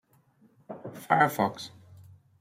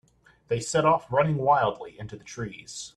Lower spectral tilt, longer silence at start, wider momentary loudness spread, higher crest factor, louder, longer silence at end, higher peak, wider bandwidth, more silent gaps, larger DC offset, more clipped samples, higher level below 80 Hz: about the same, -5 dB/octave vs -5 dB/octave; first, 0.7 s vs 0.5 s; first, 20 LU vs 17 LU; first, 24 dB vs 18 dB; about the same, -26 LUFS vs -24 LUFS; first, 0.4 s vs 0.1 s; about the same, -8 dBFS vs -8 dBFS; first, 16 kHz vs 12 kHz; neither; neither; neither; second, -76 dBFS vs -58 dBFS